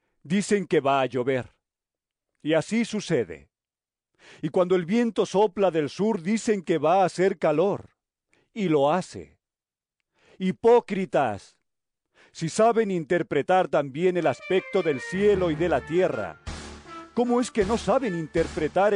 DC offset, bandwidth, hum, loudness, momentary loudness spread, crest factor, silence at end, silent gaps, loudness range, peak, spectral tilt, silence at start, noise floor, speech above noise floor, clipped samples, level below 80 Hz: under 0.1%; 10.5 kHz; none; -24 LUFS; 13 LU; 14 dB; 0 s; none; 4 LU; -10 dBFS; -6 dB/octave; 0.25 s; under -90 dBFS; over 66 dB; under 0.1%; -54 dBFS